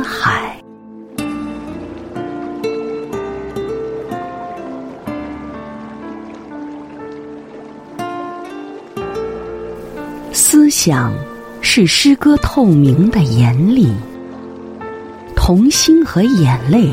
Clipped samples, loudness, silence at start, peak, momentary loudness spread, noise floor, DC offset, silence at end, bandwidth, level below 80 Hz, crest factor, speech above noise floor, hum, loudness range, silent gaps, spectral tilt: under 0.1%; -14 LUFS; 0 s; 0 dBFS; 20 LU; -36 dBFS; under 0.1%; 0 s; 16.5 kHz; -32 dBFS; 16 dB; 25 dB; none; 17 LU; none; -5 dB/octave